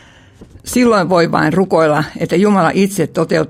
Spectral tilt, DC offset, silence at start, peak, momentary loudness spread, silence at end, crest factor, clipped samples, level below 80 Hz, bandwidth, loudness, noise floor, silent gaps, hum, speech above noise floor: -6 dB/octave; under 0.1%; 0.4 s; 0 dBFS; 5 LU; 0 s; 14 dB; under 0.1%; -46 dBFS; 16 kHz; -13 LUFS; -41 dBFS; none; none; 29 dB